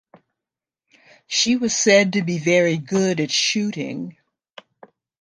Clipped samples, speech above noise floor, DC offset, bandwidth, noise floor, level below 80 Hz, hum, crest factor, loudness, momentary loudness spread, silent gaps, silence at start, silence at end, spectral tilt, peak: under 0.1%; 68 dB; under 0.1%; 10.5 kHz; -88 dBFS; -66 dBFS; none; 20 dB; -19 LUFS; 13 LU; none; 1.3 s; 1.1 s; -3.5 dB/octave; -2 dBFS